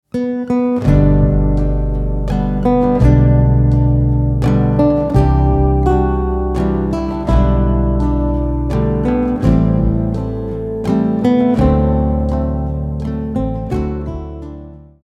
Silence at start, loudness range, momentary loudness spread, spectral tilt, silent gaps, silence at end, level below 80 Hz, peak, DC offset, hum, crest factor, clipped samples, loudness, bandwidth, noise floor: 0.15 s; 3 LU; 9 LU; -10 dB/octave; none; 0.25 s; -20 dBFS; -2 dBFS; under 0.1%; none; 12 dB; under 0.1%; -15 LUFS; 7 kHz; -34 dBFS